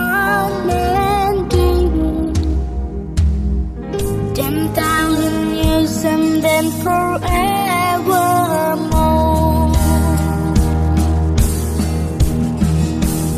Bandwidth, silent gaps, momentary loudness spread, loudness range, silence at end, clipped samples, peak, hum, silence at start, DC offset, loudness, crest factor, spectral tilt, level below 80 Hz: 15 kHz; none; 5 LU; 3 LU; 0 s; under 0.1%; -2 dBFS; none; 0 s; under 0.1%; -16 LUFS; 14 dB; -6 dB/octave; -22 dBFS